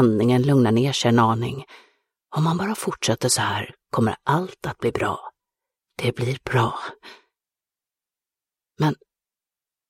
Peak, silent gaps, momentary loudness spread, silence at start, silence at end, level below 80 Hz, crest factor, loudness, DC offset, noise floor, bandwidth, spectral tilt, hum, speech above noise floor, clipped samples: -4 dBFS; none; 13 LU; 0 s; 0.95 s; -56 dBFS; 18 dB; -22 LUFS; under 0.1%; under -90 dBFS; 16 kHz; -5.5 dB/octave; none; over 69 dB; under 0.1%